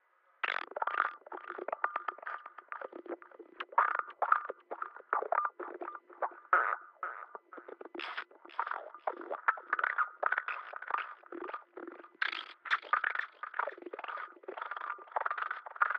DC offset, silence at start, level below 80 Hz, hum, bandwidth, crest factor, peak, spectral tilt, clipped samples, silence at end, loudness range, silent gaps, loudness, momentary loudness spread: under 0.1%; 0.45 s; under -90 dBFS; none; 6.4 kHz; 26 dB; -12 dBFS; -2 dB/octave; under 0.1%; 0 s; 3 LU; none; -36 LUFS; 15 LU